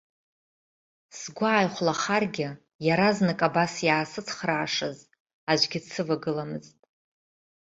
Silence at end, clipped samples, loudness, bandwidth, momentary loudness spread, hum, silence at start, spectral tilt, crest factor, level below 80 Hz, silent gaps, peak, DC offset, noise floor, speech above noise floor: 1 s; under 0.1%; -26 LUFS; 8 kHz; 13 LU; none; 1.15 s; -4.5 dB/octave; 22 dB; -66 dBFS; 2.75-2.79 s, 5.20-5.26 s, 5.33-5.47 s; -6 dBFS; under 0.1%; under -90 dBFS; over 64 dB